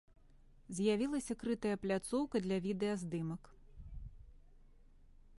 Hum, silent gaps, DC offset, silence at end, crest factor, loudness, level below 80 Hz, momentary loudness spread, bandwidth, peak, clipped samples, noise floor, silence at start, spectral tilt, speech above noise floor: none; none; under 0.1%; 0.05 s; 18 dB; -38 LUFS; -58 dBFS; 19 LU; 11.5 kHz; -22 dBFS; under 0.1%; -62 dBFS; 0.35 s; -6 dB/octave; 25 dB